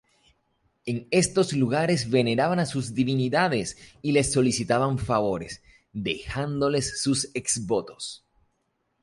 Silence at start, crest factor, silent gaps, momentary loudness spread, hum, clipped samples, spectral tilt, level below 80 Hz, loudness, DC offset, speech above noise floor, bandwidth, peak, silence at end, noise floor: 0.85 s; 20 dB; none; 13 LU; none; under 0.1%; -4.5 dB/octave; -52 dBFS; -25 LUFS; under 0.1%; 50 dB; 11.5 kHz; -6 dBFS; 0.85 s; -74 dBFS